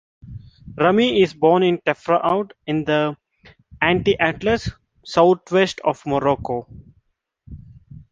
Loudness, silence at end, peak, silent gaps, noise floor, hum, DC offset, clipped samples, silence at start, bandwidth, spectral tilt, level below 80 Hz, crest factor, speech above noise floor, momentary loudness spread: -19 LUFS; 0.1 s; -2 dBFS; none; -65 dBFS; none; under 0.1%; under 0.1%; 0.25 s; 7.6 kHz; -6 dB/octave; -46 dBFS; 18 dB; 46 dB; 16 LU